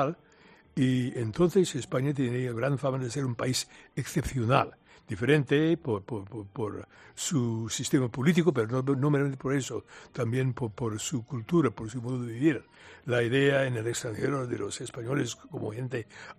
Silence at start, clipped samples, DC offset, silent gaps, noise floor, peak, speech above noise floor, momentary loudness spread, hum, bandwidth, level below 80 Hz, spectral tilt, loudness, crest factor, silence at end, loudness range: 0 s; under 0.1%; under 0.1%; none; -58 dBFS; -6 dBFS; 29 dB; 12 LU; none; 14 kHz; -56 dBFS; -5.5 dB/octave; -29 LUFS; 22 dB; 0.05 s; 2 LU